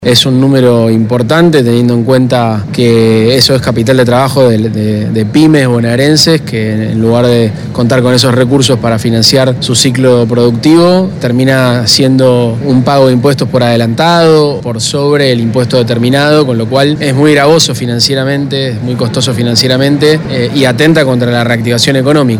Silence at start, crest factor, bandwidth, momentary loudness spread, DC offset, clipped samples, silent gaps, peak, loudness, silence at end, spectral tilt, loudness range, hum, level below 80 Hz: 0 s; 8 dB; 18 kHz; 5 LU; under 0.1%; 1%; none; 0 dBFS; -8 LUFS; 0 s; -5.5 dB/octave; 1 LU; none; -40 dBFS